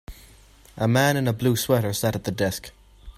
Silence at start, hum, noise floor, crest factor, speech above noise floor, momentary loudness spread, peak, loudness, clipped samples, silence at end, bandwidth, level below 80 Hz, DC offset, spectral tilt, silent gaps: 0.1 s; none; -51 dBFS; 18 dB; 29 dB; 7 LU; -6 dBFS; -23 LUFS; under 0.1%; 0.05 s; 16 kHz; -48 dBFS; under 0.1%; -5 dB/octave; none